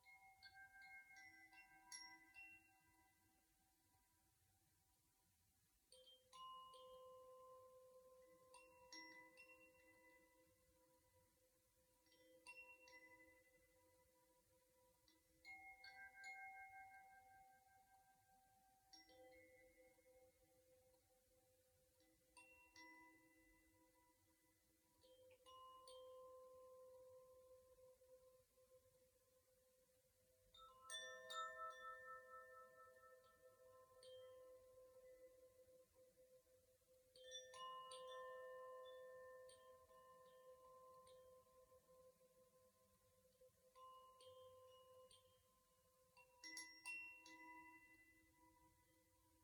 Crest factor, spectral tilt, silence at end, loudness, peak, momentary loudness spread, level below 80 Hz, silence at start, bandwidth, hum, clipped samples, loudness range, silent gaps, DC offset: 24 dB; -1 dB/octave; 0 s; -61 LUFS; -40 dBFS; 13 LU; under -90 dBFS; 0 s; 19 kHz; none; under 0.1%; 11 LU; none; under 0.1%